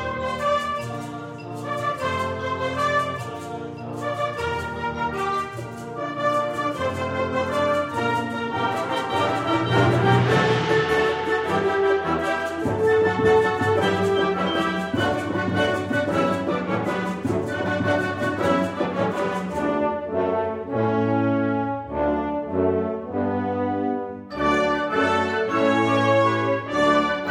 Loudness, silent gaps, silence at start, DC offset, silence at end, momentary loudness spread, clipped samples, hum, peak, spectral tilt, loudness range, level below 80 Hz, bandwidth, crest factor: -23 LUFS; none; 0 s; under 0.1%; 0 s; 8 LU; under 0.1%; none; -6 dBFS; -6 dB/octave; 5 LU; -50 dBFS; 15.5 kHz; 18 dB